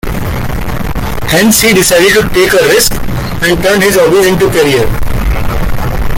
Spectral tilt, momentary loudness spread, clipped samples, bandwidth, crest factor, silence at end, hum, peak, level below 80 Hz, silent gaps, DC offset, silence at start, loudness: -4 dB/octave; 11 LU; under 0.1%; 17.5 kHz; 8 dB; 0 s; none; 0 dBFS; -18 dBFS; none; under 0.1%; 0.05 s; -9 LUFS